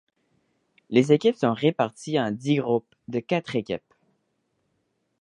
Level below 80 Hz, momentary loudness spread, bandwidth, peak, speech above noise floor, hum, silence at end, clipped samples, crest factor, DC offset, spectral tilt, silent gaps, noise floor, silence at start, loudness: -68 dBFS; 12 LU; 10.5 kHz; -4 dBFS; 50 dB; none; 1.4 s; under 0.1%; 22 dB; under 0.1%; -6.5 dB/octave; none; -74 dBFS; 0.9 s; -25 LUFS